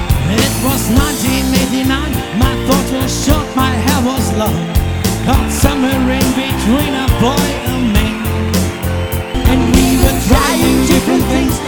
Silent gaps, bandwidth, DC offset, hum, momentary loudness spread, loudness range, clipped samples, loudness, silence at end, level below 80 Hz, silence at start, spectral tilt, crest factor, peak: none; over 20 kHz; 1%; none; 5 LU; 2 LU; under 0.1%; -13 LUFS; 0 s; -20 dBFS; 0 s; -5 dB/octave; 12 dB; 0 dBFS